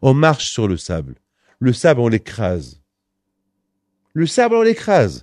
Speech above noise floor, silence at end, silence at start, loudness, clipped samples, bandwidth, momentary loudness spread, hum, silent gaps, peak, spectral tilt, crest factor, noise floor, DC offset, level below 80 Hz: 59 dB; 0.05 s; 0 s; -17 LUFS; under 0.1%; 11 kHz; 12 LU; none; none; 0 dBFS; -6 dB/octave; 18 dB; -75 dBFS; under 0.1%; -44 dBFS